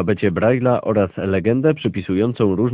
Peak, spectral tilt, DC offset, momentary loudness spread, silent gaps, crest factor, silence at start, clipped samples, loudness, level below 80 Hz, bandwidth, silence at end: -4 dBFS; -12 dB/octave; under 0.1%; 3 LU; none; 14 dB; 0 s; under 0.1%; -18 LUFS; -42 dBFS; 4 kHz; 0 s